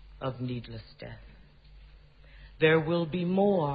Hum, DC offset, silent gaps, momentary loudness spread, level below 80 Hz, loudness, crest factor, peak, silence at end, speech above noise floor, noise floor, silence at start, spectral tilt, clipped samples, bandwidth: none; under 0.1%; none; 21 LU; -54 dBFS; -28 LUFS; 20 dB; -10 dBFS; 0 s; 25 dB; -53 dBFS; 0 s; -10.5 dB/octave; under 0.1%; 5 kHz